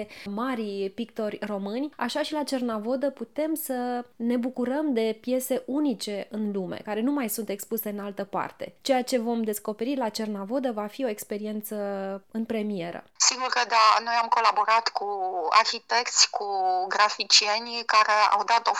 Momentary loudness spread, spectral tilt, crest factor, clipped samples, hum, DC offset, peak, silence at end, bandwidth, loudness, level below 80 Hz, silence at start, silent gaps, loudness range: 12 LU; -2 dB/octave; 22 dB; under 0.1%; none; under 0.1%; -4 dBFS; 0 s; 19.5 kHz; -26 LUFS; -76 dBFS; 0 s; none; 8 LU